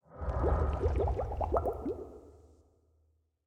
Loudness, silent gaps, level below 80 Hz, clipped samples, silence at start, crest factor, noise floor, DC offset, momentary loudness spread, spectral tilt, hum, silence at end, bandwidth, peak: -34 LUFS; none; -38 dBFS; under 0.1%; 0.1 s; 20 dB; -73 dBFS; under 0.1%; 12 LU; -9.5 dB/octave; none; 1.1 s; 6.4 kHz; -14 dBFS